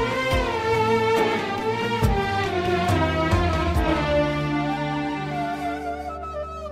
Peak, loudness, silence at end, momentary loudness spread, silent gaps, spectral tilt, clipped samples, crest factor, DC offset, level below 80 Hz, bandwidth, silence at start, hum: -8 dBFS; -23 LUFS; 0 s; 9 LU; none; -6 dB/octave; under 0.1%; 16 dB; under 0.1%; -34 dBFS; 16 kHz; 0 s; none